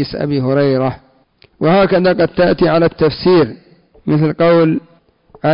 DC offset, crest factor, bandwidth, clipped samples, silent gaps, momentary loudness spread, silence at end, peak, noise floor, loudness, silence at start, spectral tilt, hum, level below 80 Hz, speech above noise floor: under 0.1%; 10 dB; 5.4 kHz; under 0.1%; none; 9 LU; 0 s; -4 dBFS; -51 dBFS; -13 LUFS; 0 s; -11 dB/octave; none; -44 dBFS; 38 dB